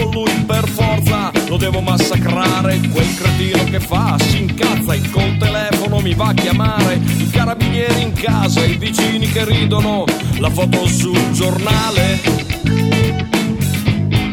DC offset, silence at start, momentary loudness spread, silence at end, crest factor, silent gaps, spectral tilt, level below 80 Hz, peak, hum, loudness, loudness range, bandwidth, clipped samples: under 0.1%; 0 s; 3 LU; 0 s; 14 dB; none; -5.5 dB/octave; -30 dBFS; 0 dBFS; none; -15 LUFS; 0 LU; 18.5 kHz; under 0.1%